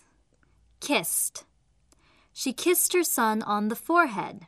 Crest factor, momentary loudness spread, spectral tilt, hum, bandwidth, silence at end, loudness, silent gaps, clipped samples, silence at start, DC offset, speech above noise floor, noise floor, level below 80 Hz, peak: 20 dB; 11 LU; -2.5 dB/octave; none; 15 kHz; 0 s; -25 LUFS; none; under 0.1%; 0.8 s; under 0.1%; 39 dB; -65 dBFS; -68 dBFS; -8 dBFS